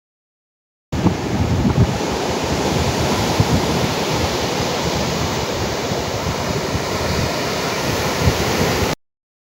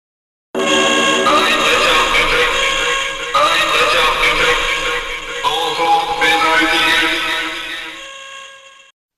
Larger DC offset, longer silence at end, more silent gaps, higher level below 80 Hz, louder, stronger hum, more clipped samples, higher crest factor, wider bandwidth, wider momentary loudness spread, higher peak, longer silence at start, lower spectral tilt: neither; about the same, 0.55 s vs 0.6 s; neither; about the same, -34 dBFS vs -36 dBFS; second, -19 LUFS vs -13 LUFS; neither; neither; first, 18 dB vs 12 dB; first, 16 kHz vs 12.5 kHz; second, 4 LU vs 13 LU; about the same, -2 dBFS vs -4 dBFS; first, 0.9 s vs 0.55 s; first, -4.5 dB/octave vs -1 dB/octave